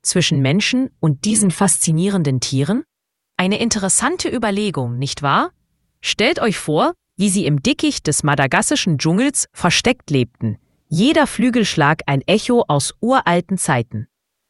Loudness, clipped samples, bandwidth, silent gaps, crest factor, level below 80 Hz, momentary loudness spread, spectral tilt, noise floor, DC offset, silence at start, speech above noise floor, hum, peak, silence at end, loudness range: -17 LUFS; under 0.1%; 12 kHz; none; 18 dB; -48 dBFS; 7 LU; -4 dB/octave; -77 dBFS; under 0.1%; 0.05 s; 61 dB; none; 0 dBFS; 0.45 s; 2 LU